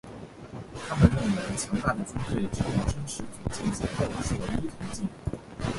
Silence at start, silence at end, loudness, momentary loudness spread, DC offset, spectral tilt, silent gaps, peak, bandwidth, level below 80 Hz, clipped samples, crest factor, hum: 0.05 s; 0 s; -30 LUFS; 15 LU; under 0.1%; -6 dB/octave; none; -2 dBFS; 11.5 kHz; -40 dBFS; under 0.1%; 26 dB; none